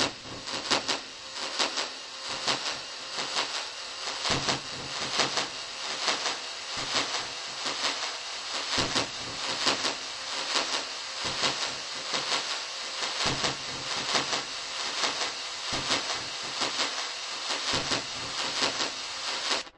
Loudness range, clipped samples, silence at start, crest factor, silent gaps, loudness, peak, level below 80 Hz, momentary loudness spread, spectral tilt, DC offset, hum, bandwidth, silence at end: 1 LU; under 0.1%; 0 s; 22 dB; none; -29 LUFS; -8 dBFS; -60 dBFS; 7 LU; -1 dB/octave; under 0.1%; none; 11.5 kHz; 0.05 s